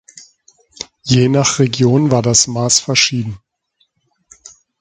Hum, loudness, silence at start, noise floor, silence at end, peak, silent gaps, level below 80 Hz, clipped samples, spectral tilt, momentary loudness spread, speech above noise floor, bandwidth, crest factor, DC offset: none; -13 LUFS; 0.15 s; -63 dBFS; 1.45 s; 0 dBFS; none; -48 dBFS; under 0.1%; -4 dB/octave; 16 LU; 50 dB; 9.6 kHz; 16 dB; under 0.1%